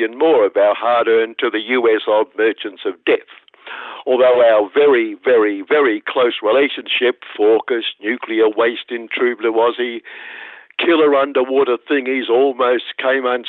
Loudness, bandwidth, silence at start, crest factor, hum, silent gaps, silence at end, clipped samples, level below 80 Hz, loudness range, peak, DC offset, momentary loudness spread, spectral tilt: -16 LUFS; 4.2 kHz; 0 s; 12 dB; none; none; 0 s; under 0.1%; -72 dBFS; 3 LU; -4 dBFS; under 0.1%; 11 LU; -7 dB/octave